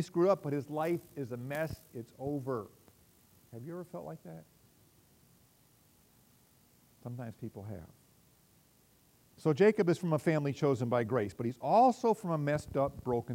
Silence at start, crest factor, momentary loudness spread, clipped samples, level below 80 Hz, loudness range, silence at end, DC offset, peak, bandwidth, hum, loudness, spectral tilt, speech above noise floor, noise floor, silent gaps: 0 s; 20 dB; 20 LU; under 0.1%; -66 dBFS; 21 LU; 0 s; under 0.1%; -14 dBFS; 16 kHz; none; -33 LUFS; -7.5 dB/octave; 34 dB; -67 dBFS; none